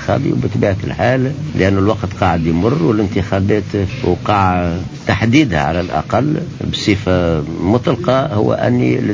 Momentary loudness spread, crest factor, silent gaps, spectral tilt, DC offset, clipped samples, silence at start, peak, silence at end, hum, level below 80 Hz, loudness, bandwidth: 5 LU; 14 dB; none; -7 dB/octave; under 0.1%; under 0.1%; 0 s; 0 dBFS; 0 s; none; -32 dBFS; -15 LUFS; 7.6 kHz